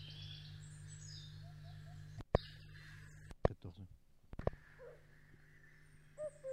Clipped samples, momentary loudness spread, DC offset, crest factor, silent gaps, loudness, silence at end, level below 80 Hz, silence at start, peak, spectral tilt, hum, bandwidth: under 0.1%; 24 LU; under 0.1%; 32 dB; none; -47 LUFS; 0 s; -56 dBFS; 0 s; -14 dBFS; -6 dB/octave; none; 15.5 kHz